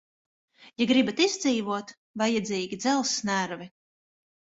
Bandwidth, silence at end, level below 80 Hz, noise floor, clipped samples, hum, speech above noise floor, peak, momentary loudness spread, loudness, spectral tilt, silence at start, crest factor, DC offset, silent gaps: 8 kHz; 0.9 s; -70 dBFS; under -90 dBFS; under 0.1%; none; over 63 dB; -8 dBFS; 11 LU; -26 LUFS; -3.5 dB/octave; 0.6 s; 20 dB; under 0.1%; 1.97-2.14 s